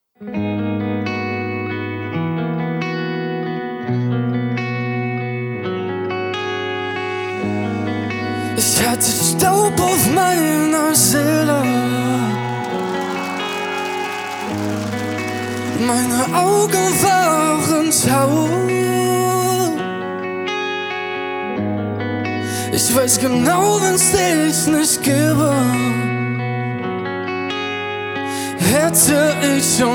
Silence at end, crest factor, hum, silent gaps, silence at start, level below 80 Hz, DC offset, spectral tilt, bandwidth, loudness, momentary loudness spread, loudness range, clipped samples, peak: 0 s; 16 dB; none; none; 0.2 s; -50 dBFS; under 0.1%; -4 dB/octave; over 20 kHz; -17 LUFS; 9 LU; 8 LU; under 0.1%; -2 dBFS